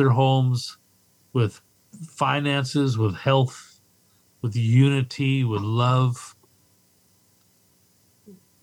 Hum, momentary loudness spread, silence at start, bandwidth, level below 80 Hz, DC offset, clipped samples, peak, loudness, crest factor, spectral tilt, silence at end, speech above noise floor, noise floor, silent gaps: none; 16 LU; 0 s; 11.5 kHz; -66 dBFS; under 0.1%; under 0.1%; -6 dBFS; -23 LUFS; 18 dB; -6.5 dB/octave; 0.3 s; 40 dB; -61 dBFS; none